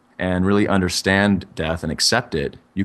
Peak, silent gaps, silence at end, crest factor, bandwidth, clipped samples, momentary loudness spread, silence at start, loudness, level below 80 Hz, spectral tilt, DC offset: -2 dBFS; none; 0 s; 18 dB; 13 kHz; under 0.1%; 9 LU; 0.2 s; -19 LUFS; -42 dBFS; -4.5 dB/octave; under 0.1%